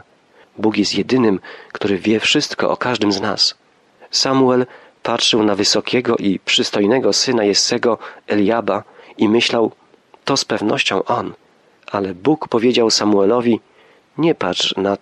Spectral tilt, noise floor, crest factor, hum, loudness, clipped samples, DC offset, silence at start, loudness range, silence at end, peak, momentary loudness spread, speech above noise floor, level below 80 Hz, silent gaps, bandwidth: -3.5 dB/octave; -51 dBFS; 14 dB; none; -16 LUFS; under 0.1%; under 0.1%; 0.55 s; 3 LU; 0.05 s; -2 dBFS; 8 LU; 35 dB; -60 dBFS; none; 12 kHz